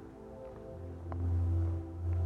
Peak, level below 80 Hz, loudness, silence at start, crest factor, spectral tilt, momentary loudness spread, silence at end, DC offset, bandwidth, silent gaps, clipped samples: -24 dBFS; -44 dBFS; -37 LUFS; 0 s; 10 dB; -10.5 dB/octave; 15 LU; 0 s; under 0.1%; 2.6 kHz; none; under 0.1%